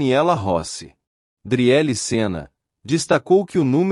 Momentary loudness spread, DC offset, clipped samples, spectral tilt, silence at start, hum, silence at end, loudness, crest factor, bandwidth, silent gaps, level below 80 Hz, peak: 9 LU; under 0.1%; under 0.1%; -5.5 dB/octave; 0 s; none; 0 s; -19 LUFS; 14 dB; 12 kHz; 1.07-1.37 s; -54 dBFS; -4 dBFS